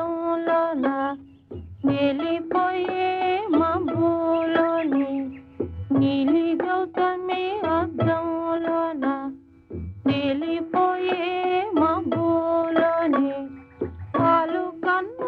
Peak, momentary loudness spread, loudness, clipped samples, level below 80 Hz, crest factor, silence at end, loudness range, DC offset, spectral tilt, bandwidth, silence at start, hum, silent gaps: -8 dBFS; 12 LU; -23 LUFS; under 0.1%; -54 dBFS; 16 dB; 0 s; 3 LU; under 0.1%; -9 dB/octave; 4.9 kHz; 0 s; none; none